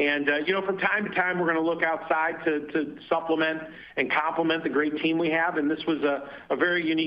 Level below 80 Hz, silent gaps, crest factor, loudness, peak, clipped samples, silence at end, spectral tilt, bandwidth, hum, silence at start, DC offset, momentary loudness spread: -66 dBFS; none; 16 dB; -26 LUFS; -8 dBFS; under 0.1%; 0 s; -7.5 dB/octave; 5.4 kHz; none; 0 s; under 0.1%; 5 LU